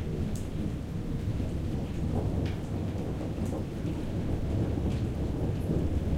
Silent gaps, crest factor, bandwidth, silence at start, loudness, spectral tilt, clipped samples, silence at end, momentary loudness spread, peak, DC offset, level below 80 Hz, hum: none; 14 dB; 15.5 kHz; 0 s; -33 LUFS; -8 dB/octave; under 0.1%; 0 s; 4 LU; -16 dBFS; under 0.1%; -38 dBFS; none